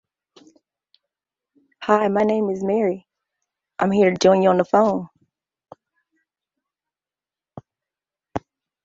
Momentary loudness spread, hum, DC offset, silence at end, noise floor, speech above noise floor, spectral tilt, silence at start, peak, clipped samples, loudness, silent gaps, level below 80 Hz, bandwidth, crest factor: 17 LU; none; under 0.1%; 0.45 s; under -90 dBFS; over 72 dB; -6 dB/octave; 1.8 s; -2 dBFS; under 0.1%; -19 LUFS; none; -62 dBFS; 7.8 kHz; 22 dB